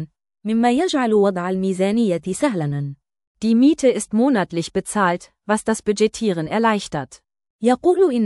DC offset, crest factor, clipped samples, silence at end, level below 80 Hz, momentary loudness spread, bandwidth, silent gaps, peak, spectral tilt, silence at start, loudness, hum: under 0.1%; 14 dB; under 0.1%; 0 s; -56 dBFS; 11 LU; 12 kHz; 3.27-3.35 s, 7.50-7.59 s; -4 dBFS; -5.5 dB/octave; 0 s; -19 LUFS; none